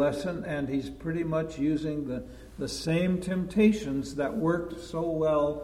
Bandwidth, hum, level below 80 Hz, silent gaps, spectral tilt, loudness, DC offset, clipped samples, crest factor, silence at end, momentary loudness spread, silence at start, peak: 14.5 kHz; none; -50 dBFS; none; -6.5 dB/octave; -29 LUFS; under 0.1%; under 0.1%; 18 dB; 0 s; 11 LU; 0 s; -10 dBFS